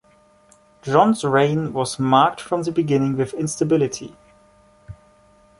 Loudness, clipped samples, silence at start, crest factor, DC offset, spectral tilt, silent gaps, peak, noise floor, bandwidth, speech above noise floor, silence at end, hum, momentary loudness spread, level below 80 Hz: -19 LUFS; under 0.1%; 0.85 s; 20 dB; under 0.1%; -5.5 dB/octave; none; -2 dBFS; -55 dBFS; 11.5 kHz; 36 dB; 0.65 s; none; 8 LU; -56 dBFS